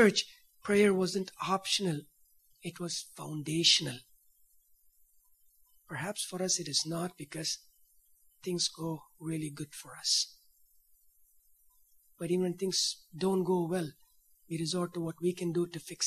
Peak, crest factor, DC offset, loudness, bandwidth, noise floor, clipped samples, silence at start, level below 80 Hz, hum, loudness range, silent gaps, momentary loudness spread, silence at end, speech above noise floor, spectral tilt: -10 dBFS; 24 dB; under 0.1%; -32 LUFS; 14.5 kHz; -67 dBFS; under 0.1%; 0 s; -74 dBFS; none; 5 LU; none; 15 LU; 0 s; 35 dB; -3.5 dB/octave